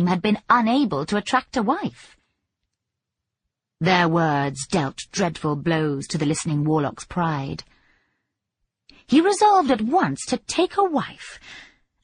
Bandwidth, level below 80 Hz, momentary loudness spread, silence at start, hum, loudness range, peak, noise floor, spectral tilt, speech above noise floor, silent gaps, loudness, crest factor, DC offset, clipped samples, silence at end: 10 kHz; -56 dBFS; 10 LU; 0 s; none; 4 LU; -2 dBFS; -83 dBFS; -5.5 dB/octave; 62 dB; none; -21 LUFS; 20 dB; under 0.1%; under 0.1%; 0.4 s